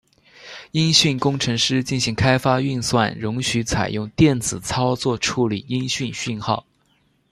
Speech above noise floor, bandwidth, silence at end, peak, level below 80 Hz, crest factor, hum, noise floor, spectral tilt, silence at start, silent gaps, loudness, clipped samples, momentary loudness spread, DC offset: 42 dB; 13.5 kHz; 0.7 s; 0 dBFS; -46 dBFS; 20 dB; none; -63 dBFS; -4.5 dB/octave; 0.4 s; none; -20 LUFS; under 0.1%; 9 LU; under 0.1%